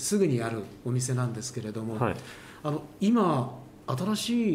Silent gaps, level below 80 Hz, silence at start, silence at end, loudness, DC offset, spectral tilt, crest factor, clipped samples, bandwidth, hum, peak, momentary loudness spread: none; -62 dBFS; 0 s; 0 s; -29 LUFS; under 0.1%; -5.5 dB/octave; 16 dB; under 0.1%; 16 kHz; none; -12 dBFS; 12 LU